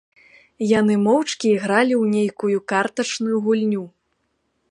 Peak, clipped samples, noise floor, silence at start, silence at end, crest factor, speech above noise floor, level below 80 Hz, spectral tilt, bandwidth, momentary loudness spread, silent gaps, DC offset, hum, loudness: -2 dBFS; under 0.1%; -70 dBFS; 0.6 s; 0.8 s; 18 dB; 51 dB; -64 dBFS; -5 dB/octave; 10.5 kHz; 6 LU; none; under 0.1%; none; -20 LUFS